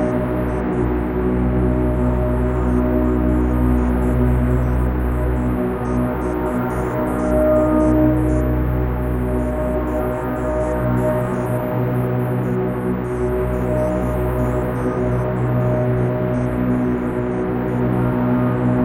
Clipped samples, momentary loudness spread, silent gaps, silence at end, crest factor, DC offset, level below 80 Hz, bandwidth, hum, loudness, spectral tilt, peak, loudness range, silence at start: under 0.1%; 4 LU; none; 0 s; 14 dB; under 0.1%; -26 dBFS; 16.5 kHz; none; -19 LUFS; -9.5 dB/octave; -4 dBFS; 2 LU; 0 s